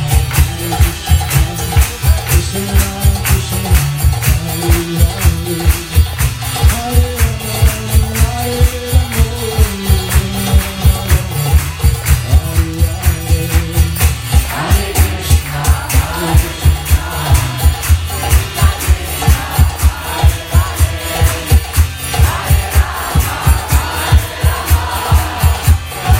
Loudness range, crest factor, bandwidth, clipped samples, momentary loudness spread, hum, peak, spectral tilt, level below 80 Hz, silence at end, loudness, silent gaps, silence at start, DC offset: 0 LU; 12 dB; 16.5 kHz; under 0.1%; 3 LU; none; 0 dBFS; -4.5 dB/octave; -16 dBFS; 0 s; -14 LUFS; none; 0 s; under 0.1%